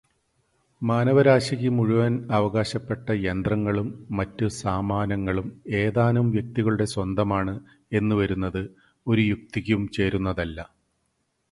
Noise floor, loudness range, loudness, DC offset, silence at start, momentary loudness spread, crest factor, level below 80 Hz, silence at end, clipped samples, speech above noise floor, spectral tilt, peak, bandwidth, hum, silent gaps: -73 dBFS; 4 LU; -24 LUFS; under 0.1%; 0.8 s; 9 LU; 20 dB; -46 dBFS; 0.9 s; under 0.1%; 50 dB; -7 dB/octave; -4 dBFS; 11.5 kHz; none; none